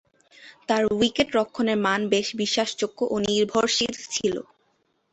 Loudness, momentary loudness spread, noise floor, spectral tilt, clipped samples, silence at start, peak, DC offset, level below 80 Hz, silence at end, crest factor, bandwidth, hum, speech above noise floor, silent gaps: -24 LUFS; 6 LU; -69 dBFS; -3.5 dB/octave; under 0.1%; 0.4 s; -6 dBFS; under 0.1%; -58 dBFS; 0.7 s; 20 dB; 8.4 kHz; none; 45 dB; none